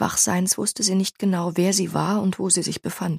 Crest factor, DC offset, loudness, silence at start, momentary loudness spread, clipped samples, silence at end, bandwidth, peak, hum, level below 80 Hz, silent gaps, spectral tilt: 18 dB; under 0.1%; -21 LUFS; 0 s; 4 LU; under 0.1%; 0 s; 15.5 kHz; -4 dBFS; none; -60 dBFS; none; -4 dB/octave